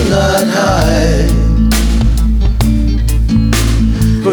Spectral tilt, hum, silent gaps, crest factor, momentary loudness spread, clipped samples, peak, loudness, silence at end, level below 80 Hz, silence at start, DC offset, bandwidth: -6 dB/octave; none; none; 10 dB; 2 LU; under 0.1%; 0 dBFS; -12 LUFS; 0 s; -12 dBFS; 0 s; under 0.1%; 19.5 kHz